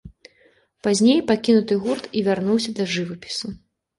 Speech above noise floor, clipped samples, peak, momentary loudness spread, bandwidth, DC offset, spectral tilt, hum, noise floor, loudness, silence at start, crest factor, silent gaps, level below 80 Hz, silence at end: 39 dB; under 0.1%; -6 dBFS; 12 LU; 11.5 kHz; under 0.1%; -5 dB/octave; none; -59 dBFS; -21 LUFS; 0.05 s; 16 dB; none; -56 dBFS; 0.4 s